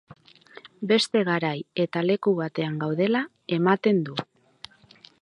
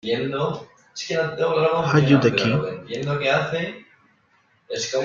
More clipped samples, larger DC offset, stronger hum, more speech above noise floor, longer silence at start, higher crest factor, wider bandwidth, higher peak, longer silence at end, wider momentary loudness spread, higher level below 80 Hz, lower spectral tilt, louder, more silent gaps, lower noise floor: neither; neither; neither; second, 30 dB vs 41 dB; about the same, 0.1 s vs 0.05 s; about the same, 20 dB vs 20 dB; first, 11 kHz vs 7.6 kHz; about the same, -6 dBFS vs -4 dBFS; first, 1 s vs 0 s; first, 23 LU vs 16 LU; second, -72 dBFS vs -60 dBFS; about the same, -6 dB/octave vs -5.5 dB/octave; second, -25 LUFS vs -22 LUFS; neither; second, -54 dBFS vs -62 dBFS